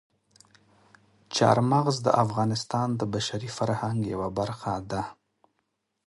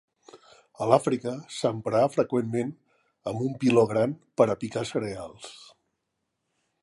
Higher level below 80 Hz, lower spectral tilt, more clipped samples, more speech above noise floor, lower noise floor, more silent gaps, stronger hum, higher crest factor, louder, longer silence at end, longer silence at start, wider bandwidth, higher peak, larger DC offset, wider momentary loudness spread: first, -58 dBFS vs -66 dBFS; about the same, -5.5 dB/octave vs -6.5 dB/octave; neither; about the same, 52 dB vs 55 dB; about the same, -78 dBFS vs -80 dBFS; neither; neither; about the same, 24 dB vs 24 dB; about the same, -27 LUFS vs -26 LUFS; second, 0.95 s vs 1.2 s; first, 1.3 s vs 0.35 s; about the same, 11.5 kHz vs 11.5 kHz; about the same, -4 dBFS vs -4 dBFS; neither; second, 10 LU vs 14 LU